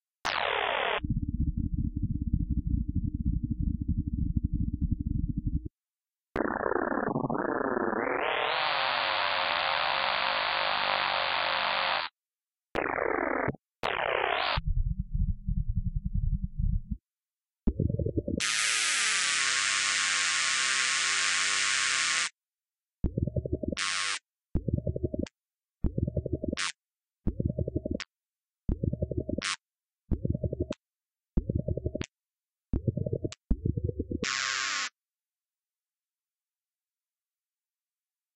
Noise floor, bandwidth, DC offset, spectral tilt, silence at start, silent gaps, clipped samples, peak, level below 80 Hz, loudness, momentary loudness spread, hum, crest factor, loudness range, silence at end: under -90 dBFS; 10.5 kHz; under 0.1%; -3.5 dB/octave; 0.25 s; none; under 0.1%; -10 dBFS; -38 dBFS; -30 LUFS; 12 LU; none; 20 dB; 9 LU; 3.45 s